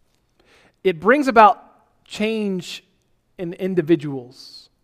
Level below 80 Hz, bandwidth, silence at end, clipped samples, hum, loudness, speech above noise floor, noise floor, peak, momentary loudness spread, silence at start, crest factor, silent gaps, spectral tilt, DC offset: -60 dBFS; 15 kHz; 0.25 s; under 0.1%; none; -19 LUFS; 45 dB; -64 dBFS; 0 dBFS; 23 LU; 0.85 s; 20 dB; none; -6 dB/octave; under 0.1%